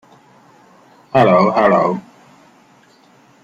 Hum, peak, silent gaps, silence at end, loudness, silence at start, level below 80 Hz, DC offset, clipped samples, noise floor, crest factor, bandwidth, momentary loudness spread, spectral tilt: none; -2 dBFS; none; 1.45 s; -14 LUFS; 1.15 s; -56 dBFS; under 0.1%; under 0.1%; -50 dBFS; 16 dB; 7.8 kHz; 8 LU; -7.5 dB/octave